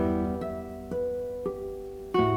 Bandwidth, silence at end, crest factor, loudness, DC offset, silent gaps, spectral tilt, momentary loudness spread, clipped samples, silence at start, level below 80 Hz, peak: 17 kHz; 0 s; 16 dB; -32 LUFS; under 0.1%; none; -8 dB/octave; 10 LU; under 0.1%; 0 s; -50 dBFS; -12 dBFS